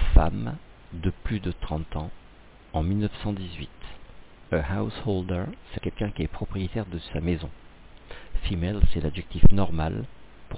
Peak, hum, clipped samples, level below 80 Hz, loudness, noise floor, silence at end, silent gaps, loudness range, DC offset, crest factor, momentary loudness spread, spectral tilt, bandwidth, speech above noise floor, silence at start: -4 dBFS; none; under 0.1%; -30 dBFS; -29 LUFS; -50 dBFS; 0 s; none; 4 LU; under 0.1%; 20 dB; 17 LU; -11 dB/octave; 4 kHz; 27 dB; 0 s